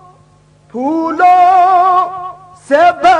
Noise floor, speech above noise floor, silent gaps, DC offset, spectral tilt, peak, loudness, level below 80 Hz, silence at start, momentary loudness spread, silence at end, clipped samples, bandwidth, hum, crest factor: -46 dBFS; 37 dB; none; under 0.1%; -4.5 dB/octave; 0 dBFS; -10 LUFS; -52 dBFS; 0.75 s; 17 LU; 0 s; under 0.1%; 9.8 kHz; none; 10 dB